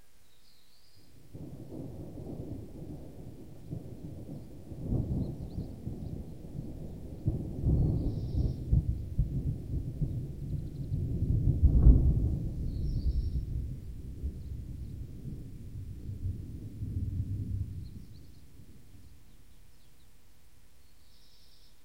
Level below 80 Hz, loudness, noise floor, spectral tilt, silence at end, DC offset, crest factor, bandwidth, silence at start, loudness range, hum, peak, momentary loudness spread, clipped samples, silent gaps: -36 dBFS; -35 LUFS; -64 dBFS; -10 dB/octave; 2.7 s; 0.3%; 26 dB; 9.8 kHz; 1.15 s; 15 LU; none; -8 dBFS; 16 LU; under 0.1%; none